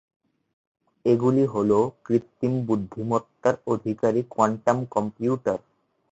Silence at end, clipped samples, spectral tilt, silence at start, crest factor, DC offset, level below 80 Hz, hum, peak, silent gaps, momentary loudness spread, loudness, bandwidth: 0.55 s; under 0.1%; -8 dB/octave; 1.05 s; 20 dB; under 0.1%; -60 dBFS; none; -6 dBFS; none; 6 LU; -24 LUFS; 8 kHz